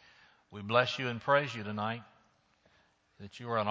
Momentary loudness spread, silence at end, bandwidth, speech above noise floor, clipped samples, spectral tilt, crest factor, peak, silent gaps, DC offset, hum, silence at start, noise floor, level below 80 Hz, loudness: 20 LU; 0 s; 8 kHz; 37 dB; under 0.1%; -5.5 dB/octave; 24 dB; -10 dBFS; none; under 0.1%; none; 0.5 s; -69 dBFS; -70 dBFS; -32 LUFS